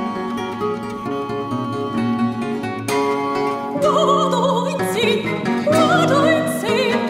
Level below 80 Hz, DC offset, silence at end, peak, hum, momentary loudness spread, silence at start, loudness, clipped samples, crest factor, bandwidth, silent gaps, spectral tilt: -54 dBFS; under 0.1%; 0 s; -2 dBFS; none; 9 LU; 0 s; -19 LUFS; under 0.1%; 16 dB; 16 kHz; none; -5 dB/octave